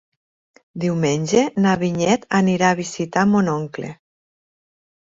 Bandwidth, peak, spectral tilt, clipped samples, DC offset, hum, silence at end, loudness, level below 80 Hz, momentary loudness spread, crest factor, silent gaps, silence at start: 7.8 kHz; -2 dBFS; -5.5 dB/octave; under 0.1%; under 0.1%; none; 1.1 s; -19 LUFS; -56 dBFS; 11 LU; 18 dB; none; 0.75 s